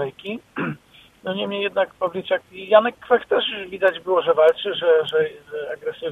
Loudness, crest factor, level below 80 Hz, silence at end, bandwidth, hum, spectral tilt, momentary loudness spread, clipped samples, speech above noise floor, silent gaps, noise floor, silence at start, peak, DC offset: -21 LUFS; 20 dB; -64 dBFS; 0 s; 4.1 kHz; none; -6 dB/octave; 13 LU; under 0.1%; 29 dB; none; -50 dBFS; 0 s; -2 dBFS; under 0.1%